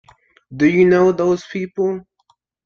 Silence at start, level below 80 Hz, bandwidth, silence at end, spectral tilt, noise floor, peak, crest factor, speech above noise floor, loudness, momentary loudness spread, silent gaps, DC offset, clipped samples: 0.5 s; -56 dBFS; 7 kHz; 0.65 s; -7.5 dB/octave; -62 dBFS; -2 dBFS; 16 dB; 47 dB; -16 LUFS; 15 LU; none; under 0.1%; under 0.1%